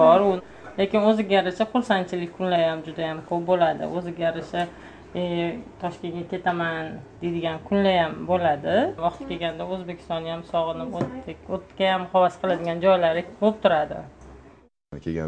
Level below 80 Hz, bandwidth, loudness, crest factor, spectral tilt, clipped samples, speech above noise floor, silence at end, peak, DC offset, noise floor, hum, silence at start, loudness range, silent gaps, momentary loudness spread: -54 dBFS; 9.4 kHz; -24 LUFS; 20 dB; -7 dB/octave; under 0.1%; 29 dB; 0 s; -4 dBFS; under 0.1%; -53 dBFS; none; 0 s; 5 LU; none; 12 LU